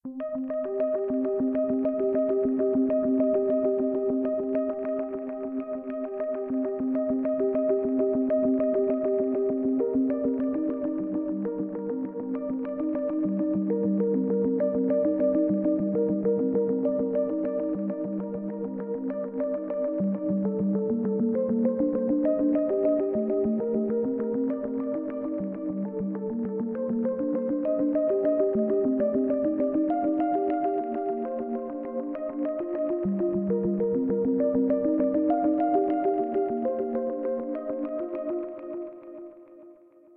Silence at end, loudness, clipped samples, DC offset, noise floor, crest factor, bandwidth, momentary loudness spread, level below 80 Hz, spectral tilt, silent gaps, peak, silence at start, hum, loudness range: 0.4 s; -27 LUFS; under 0.1%; under 0.1%; -52 dBFS; 14 dB; 3.2 kHz; 8 LU; -64 dBFS; -13 dB/octave; none; -12 dBFS; 0.05 s; none; 4 LU